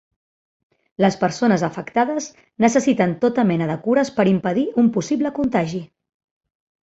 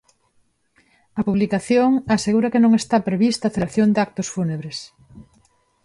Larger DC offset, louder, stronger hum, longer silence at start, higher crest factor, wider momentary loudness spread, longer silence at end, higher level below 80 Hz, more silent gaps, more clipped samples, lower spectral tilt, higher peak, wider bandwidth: neither; about the same, -19 LUFS vs -19 LUFS; neither; second, 1 s vs 1.15 s; about the same, 18 dB vs 14 dB; second, 5 LU vs 9 LU; first, 0.95 s vs 0.65 s; second, -58 dBFS vs -52 dBFS; neither; neither; about the same, -6 dB/octave vs -6 dB/octave; first, -2 dBFS vs -6 dBFS; second, 8 kHz vs 11.5 kHz